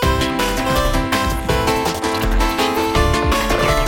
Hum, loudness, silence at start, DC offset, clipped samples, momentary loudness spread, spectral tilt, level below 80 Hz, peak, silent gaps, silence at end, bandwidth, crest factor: none; -17 LUFS; 0 s; under 0.1%; under 0.1%; 2 LU; -4.5 dB/octave; -22 dBFS; -2 dBFS; none; 0 s; 17 kHz; 14 dB